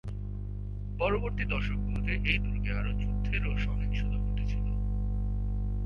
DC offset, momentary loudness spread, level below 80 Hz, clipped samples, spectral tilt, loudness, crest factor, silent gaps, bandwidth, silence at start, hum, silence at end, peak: under 0.1%; 9 LU; -32 dBFS; under 0.1%; -8 dB/octave; -32 LUFS; 18 dB; none; 5.8 kHz; 0.05 s; 50 Hz at -30 dBFS; 0 s; -12 dBFS